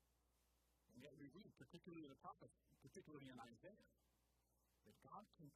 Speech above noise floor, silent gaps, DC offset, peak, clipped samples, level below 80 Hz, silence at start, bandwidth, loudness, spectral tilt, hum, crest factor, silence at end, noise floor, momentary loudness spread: 21 dB; none; under 0.1%; -46 dBFS; under 0.1%; -86 dBFS; 0 s; 15 kHz; -63 LUFS; -5.5 dB/octave; none; 18 dB; 0 s; -85 dBFS; 6 LU